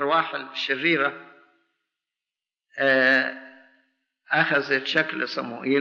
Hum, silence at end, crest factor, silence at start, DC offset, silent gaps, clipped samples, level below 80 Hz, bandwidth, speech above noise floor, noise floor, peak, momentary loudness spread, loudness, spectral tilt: none; 0 s; 18 dB; 0 s; under 0.1%; none; under 0.1%; -82 dBFS; 7.6 kHz; 67 dB; -90 dBFS; -8 dBFS; 11 LU; -23 LUFS; -1.5 dB/octave